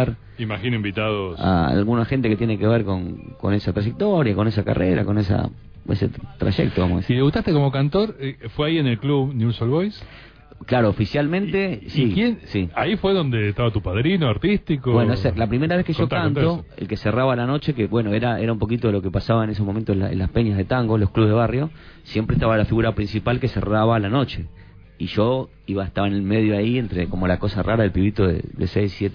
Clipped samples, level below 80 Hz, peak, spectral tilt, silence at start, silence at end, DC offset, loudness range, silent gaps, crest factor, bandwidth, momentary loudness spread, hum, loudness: under 0.1%; -38 dBFS; -6 dBFS; -9.5 dB/octave; 0 s; 0 s; under 0.1%; 2 LU; none; 14 dB; 5.4 kHz; 7 LU; none; -21 LUFS